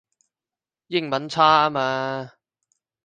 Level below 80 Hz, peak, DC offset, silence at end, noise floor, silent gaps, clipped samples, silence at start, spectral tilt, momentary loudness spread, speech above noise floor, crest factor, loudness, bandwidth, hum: -64 dBFS; -2 dBFS; under 0.1%; 0.8 s; under -90 dBFS; none; under 0.1%; 0.9 s; -5 dB/octave; 14 LU; over 69 dB; 22 dB; -21 LUFS; 9.4 kHz; none